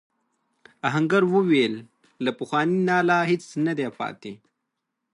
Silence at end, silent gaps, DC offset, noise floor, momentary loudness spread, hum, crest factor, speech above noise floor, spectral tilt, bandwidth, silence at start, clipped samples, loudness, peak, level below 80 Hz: 0.8 s; none; under 0.1%; -81 dBFS; 13 LU; none; 18 dB; 58 dB; -6.5 dB/octave; 11 kHz; 0.85 s; under 0.1%; -23 LUFS; -8 dBFS; -74 dBFS